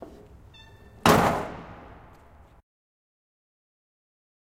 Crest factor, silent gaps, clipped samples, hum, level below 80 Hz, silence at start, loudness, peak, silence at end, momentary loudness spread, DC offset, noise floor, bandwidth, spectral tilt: 28 dB; none; under 0.1%; none; -50 dBFS; 0 s; -23 LUFS; -4 dBFS; 2.85 s; 27 LU; under 0.1%; -53 dBFS; 16 kHz; -5 dB/octave